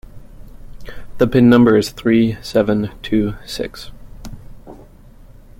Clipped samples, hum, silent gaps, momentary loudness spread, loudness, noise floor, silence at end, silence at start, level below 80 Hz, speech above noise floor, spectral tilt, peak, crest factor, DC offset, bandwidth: under 0.1%; none; none; 27 LU; -15 LUFS; -41 dBFS; 0.85 s; 0.15 s; -38 dBFS; 27 dB; -7 dB/octave; -2 dBFS; 16 dB; under 0.1%; 16 kHz